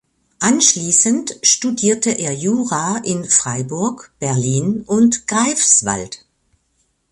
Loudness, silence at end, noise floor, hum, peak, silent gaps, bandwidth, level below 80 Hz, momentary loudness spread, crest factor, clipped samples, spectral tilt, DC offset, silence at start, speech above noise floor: -15 LUFS; 0.95 s; -65 dBFS; none; 0 dBFS; none; 11.5 kHz; -54 dBFS; 10 LU; 18 dB; under 0.1%; -3 dB/octave; under 0.1%; 0.4 s; 48 dB